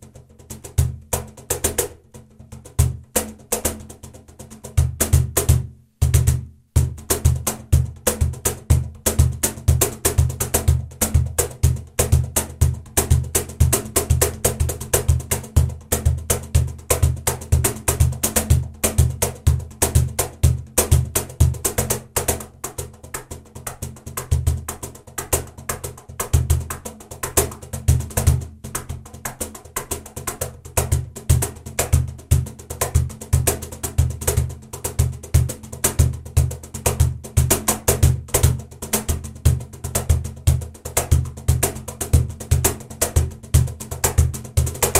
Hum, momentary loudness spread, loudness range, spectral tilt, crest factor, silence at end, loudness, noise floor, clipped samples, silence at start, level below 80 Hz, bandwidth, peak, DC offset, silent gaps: none; 11 LU; 5 LU; -4.5 dB/octave; 18 dB; 0 s; -21 LUFS; -44 dBFS; under 0.1%; 0.05 s; -26 dBFS; 16.5 kHz; -2 dBFS; under 0.1%; none